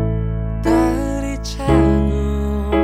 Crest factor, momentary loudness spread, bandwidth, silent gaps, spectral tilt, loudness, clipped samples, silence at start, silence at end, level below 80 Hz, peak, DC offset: 14 dB; 8 LU; 14 kHz; none; -7.5 dB/octave; -18 LUFS; under 0.1%; 0 s; 0 s; -22 dBFS; -2 dBFS; under 0.1%